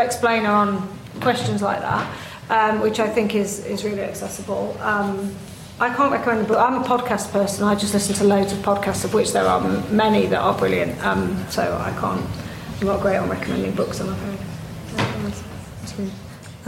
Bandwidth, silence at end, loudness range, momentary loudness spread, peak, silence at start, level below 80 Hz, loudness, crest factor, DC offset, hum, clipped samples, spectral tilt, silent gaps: 16.5 kHz; 0 s; 5 LU; 13 LU; -6 dBFS; 0 s; -46 dBFS; -21 LUFS; 14 dB; under 0.1%; none; under 0.1%; -5 dB/octave; none